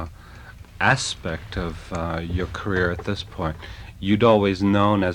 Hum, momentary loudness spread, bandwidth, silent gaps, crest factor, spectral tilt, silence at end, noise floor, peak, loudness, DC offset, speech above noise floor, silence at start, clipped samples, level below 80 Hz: none; 16 LU; 12 kHz; none; 20 dB; -5.5 dB/octave; 0 s; -42 dBFS; -4 dBFS; -23 LUFS; under 0.1%; 20 dB; 0 s; under 0.1%; -40 dBFS